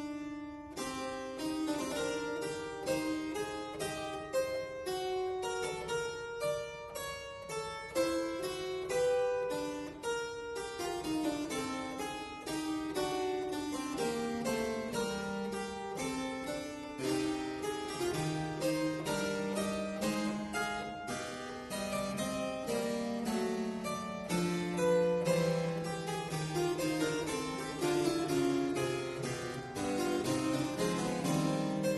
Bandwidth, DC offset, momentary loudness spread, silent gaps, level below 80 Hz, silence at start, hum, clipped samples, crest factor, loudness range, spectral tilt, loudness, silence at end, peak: 12 kHz; under 0.1%; 8 LU; none; -62 dBFS; 0 s; none; under 0.1%; 16 dB; 4 LU; -4.5 dB/octave; -36 LUFS; 0 s; -20 dBFS